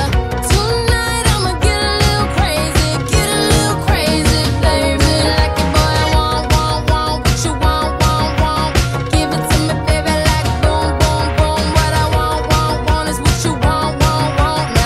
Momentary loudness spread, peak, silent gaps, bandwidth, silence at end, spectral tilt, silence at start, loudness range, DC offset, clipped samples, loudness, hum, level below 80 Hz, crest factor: 2 LU; 0 dBFS; none; 15 kHz; 0 s; -4.5 dB/octave; 0 s; 1 LU; under 0.1%; under 0.1%; -14 LUFS; none; -20 dBFS; 14 dB